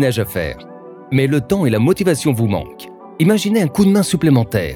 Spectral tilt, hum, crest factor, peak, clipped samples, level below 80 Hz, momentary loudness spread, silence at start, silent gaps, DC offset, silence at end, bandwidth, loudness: -6.5 dB/octave; none; 14 dB; -2 dBFS; under 0.1%; -42 dBFS; 17 LU; 0 s; none; under 0.1%; 0 s; 19 kHz; -16 LUFS